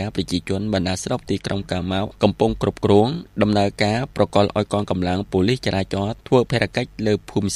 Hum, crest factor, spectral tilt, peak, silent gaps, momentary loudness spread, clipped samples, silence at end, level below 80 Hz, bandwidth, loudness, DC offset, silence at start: none; 20 dB; -6 dB/octave; 0 dBFS; none; 7 LU; under 0.1%; 0 s; -42 dBFS; 13 kHz; -21 LUFS; under 0.1%; 0 s